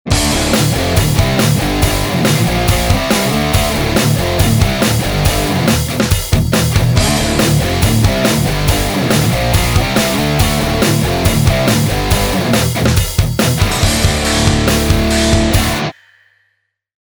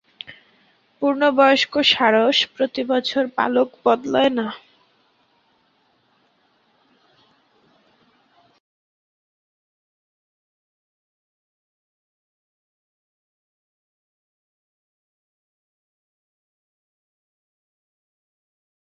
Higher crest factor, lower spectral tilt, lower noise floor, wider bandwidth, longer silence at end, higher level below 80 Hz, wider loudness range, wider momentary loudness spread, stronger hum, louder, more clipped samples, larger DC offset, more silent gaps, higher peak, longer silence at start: second, 12 dB vs 24 dB; about the same, -4.5 dB/octave vs -3.5 dB/octave; about the same, -65 dBFS vs -63 dBFS; first, over 20 kHz vs 7.6 kHz; second, 1.15 s vs 14.35 s; first, -22 dBFS vs -70 dBFS; second, 1 LU vs 9 LU; second, 2 LU vs 15 LU; neither; first, -13 LUFS vs -18 LUFS; neither; first, 0.1% vs under 0.1%; neither; about the same, 0 dBFS vs -2 dBFS; second, 0.05 s vs 0.3 s